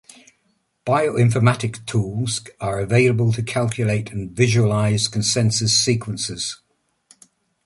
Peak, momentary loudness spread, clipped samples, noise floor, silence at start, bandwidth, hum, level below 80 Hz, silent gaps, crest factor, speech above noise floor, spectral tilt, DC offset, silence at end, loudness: -2 dBFS; 10 LU; under 0.1%; -67 dBFS; 0.85 s; 11.5 kHz; none; -50 dBFS; none; 18 dB; 48 dB; -4.5 dB/octave; under 0.1%; 1.1 s; -20 LUFS